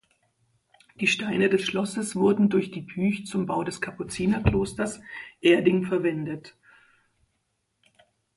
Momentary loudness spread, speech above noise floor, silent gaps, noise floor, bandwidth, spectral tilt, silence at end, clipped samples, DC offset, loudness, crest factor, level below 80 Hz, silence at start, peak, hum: 12 LU; 51 dB; none; -75 dBFS; 11.5 kHz; -5.5 dB/octave; 1.85 s; under 0.1%; under 0.1%; -25 LUFS; 22 dB; -46 dBFS; 1 s; -4 dBFS; none